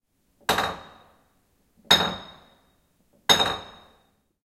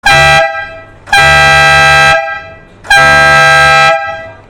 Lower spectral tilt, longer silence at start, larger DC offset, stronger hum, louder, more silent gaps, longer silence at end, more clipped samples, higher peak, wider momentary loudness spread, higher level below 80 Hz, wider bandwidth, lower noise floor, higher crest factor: about the same, -1.5 dB/octave vs -2.5 dB/octave; first, 0.5 s vs 0.05 s; neither; neither; second, -22 LUFS vs -4 LUFS; neither; first, 0.75 s vs 0.15 s; second, under 0.1% vs 0.6%; about the same, -2 dBFS vs 0 dBFS; about the same, 16 LU vs 16 LU; second, -56 dBFS vs -28 dBFS; about the same, 16.5 kHz vs 17 kHz; first, -66 dBFS vs -30 dBFS; first, 26 dB vs 6 dB